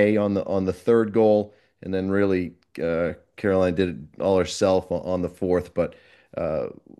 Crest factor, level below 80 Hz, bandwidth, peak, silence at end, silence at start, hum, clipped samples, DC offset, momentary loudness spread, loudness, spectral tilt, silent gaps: 18 dB; -56 dBFS; 12 kHz; -6 dBFS; 0.25 s; 0 s; none; under 0.1%; under 0.1%; 10 LU; -24 LUFS; -6.5 dB/octave; none